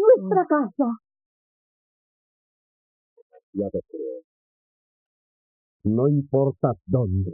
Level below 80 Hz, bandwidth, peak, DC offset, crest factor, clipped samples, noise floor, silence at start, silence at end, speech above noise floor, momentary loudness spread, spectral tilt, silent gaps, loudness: -62 dBFS; 2.1 kHz; -4 dBFS; under 0.1%; 20 dB; under 0.1%; under -90 dBFS; 0 s; 0 s; over 67 dB; 15 LU; -12.5 dB/octave; 1.26-3.16 s, 3.22-3.30 s, 3.43-3.53 s, 4.24-5.80 s; -23 LUFS